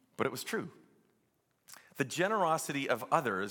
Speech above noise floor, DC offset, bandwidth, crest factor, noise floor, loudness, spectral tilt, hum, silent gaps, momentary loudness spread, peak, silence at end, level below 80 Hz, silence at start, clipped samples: 43 dB; under 0.1%; 17.5 kHz; 22 dB; -76 dBFS; -33 LUFS; -4 dB/octave; none; none; 9 LU; -12 dBFS; 0 s; -86 dBFS; 0.2 s; under 0.1%